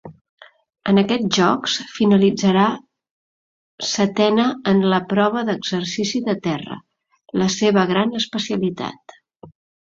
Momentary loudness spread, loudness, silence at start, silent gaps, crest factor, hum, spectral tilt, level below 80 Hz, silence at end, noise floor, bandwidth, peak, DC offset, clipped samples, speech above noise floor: 11 LU; -19 LUFS; 0.05 s; 0.21-0.38 s, 3.11-3.78 s; 18 dB; none; -5 dB/octave; -60 dBFS; 0.4 s; under -90 dBFS; 7.6 kHz; -2 dBFS; under 0.1%; under 0.1%; over 72 dB